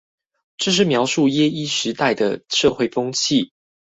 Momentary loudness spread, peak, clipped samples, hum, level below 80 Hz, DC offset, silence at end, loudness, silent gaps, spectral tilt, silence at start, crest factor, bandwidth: 5 LU; -4 dBFS; under 0.1%; none; -56 dBFS; under 0.1%; 0.5 s; -19 LUFS; none; -4 dB/octave; 0.6 s; 16 dB; 8.2 kHz